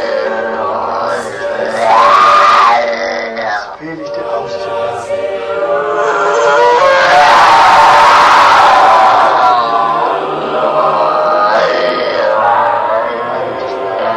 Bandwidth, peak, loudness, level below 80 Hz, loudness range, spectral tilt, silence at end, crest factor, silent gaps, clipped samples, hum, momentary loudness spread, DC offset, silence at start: 14 kHz; 0 dBFS; -10 LUFS; -48 dBFS; 8 LU; -3 dB/octave; 0 s; 10 dB; none; 0.6%; none; 13 LU; under 0.1%; 0 s